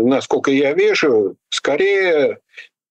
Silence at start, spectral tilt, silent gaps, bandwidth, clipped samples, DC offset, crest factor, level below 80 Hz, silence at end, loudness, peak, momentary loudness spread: 0 s; -4 dB/octave; none; 9 kHz; under 0.1%; under 0.1%; 10 dB; -64 dBFS; 0.25 s; -16 LUFS; -6 dBFS; 7 LU